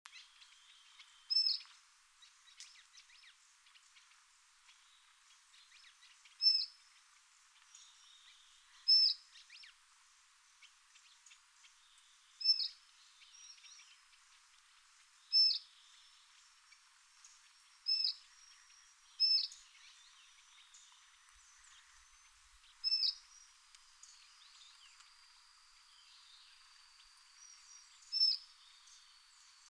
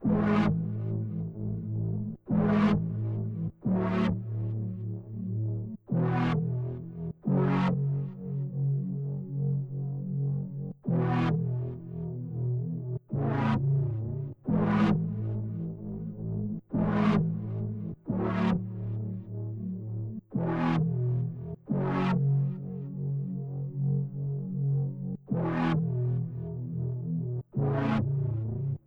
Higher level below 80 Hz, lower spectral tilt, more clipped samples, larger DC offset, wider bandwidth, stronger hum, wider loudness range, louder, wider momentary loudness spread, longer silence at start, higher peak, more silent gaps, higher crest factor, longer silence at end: second, -84 dBFS vs -52 dBFS; second, 6.5 dB/octave vs -10 dB/octave; neither; neither; first, 11 kHz vs 5.8 kHz; neither; first, 6 LU vs 2 LU; about the same, -32 LUFS vs -31 LUFS; first, 30 LU vs 10 LU; first, 0.15 s vs 0 s; second, -22 dBFS vs -16 dBFS; neither; first, 22 dB vs 14 dB; first, 1.3 s vs 0.1 s